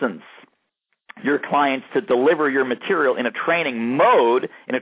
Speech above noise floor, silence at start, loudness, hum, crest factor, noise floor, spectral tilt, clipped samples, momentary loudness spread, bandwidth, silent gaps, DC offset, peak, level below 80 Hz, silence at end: 55 dB; 0 s; -19 LUFS; none; 16 dB; -74 dBFS; -9 dB/octave; under 0.1%; 9 LU; 4 kHz; none; under 0.1%; -6 dBFS; -72 dBFS; 0 s